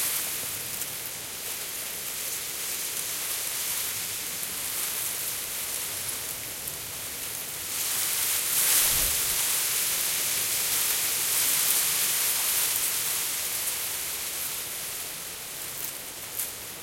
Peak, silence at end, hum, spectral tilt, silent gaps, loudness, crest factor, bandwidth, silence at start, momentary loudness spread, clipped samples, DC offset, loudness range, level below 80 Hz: -8 dBFS; 0 s; none; 1 dB/octave; none; -26 LUFS; 22 dB; 16.5 kHz; 0 s; 11 LU; under 0.1%; under 0.1%; 7 LU; -56 dBFS